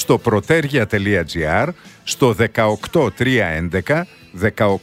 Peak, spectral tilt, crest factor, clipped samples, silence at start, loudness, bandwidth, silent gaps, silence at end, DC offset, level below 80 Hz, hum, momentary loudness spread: 0 dBFS; -5.5 dB/octave; 16 dB; under 0.1%; 0 s; -18 LUFS; 16 kHz; none; 0.05 s; under 0.1%; -40 dBFS; none; 6 LU